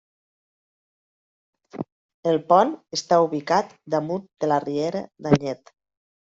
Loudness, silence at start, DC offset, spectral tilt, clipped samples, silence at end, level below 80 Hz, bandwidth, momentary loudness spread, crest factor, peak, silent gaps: -23 LUFS; 1.75 s; under 0.1%; -6 dB/octave; under 0.1%; 0.75 s; -60 dBFS; 7.8 kHz; 17 LU; 22 dB; -2 dBFS; 1.92-2.23 s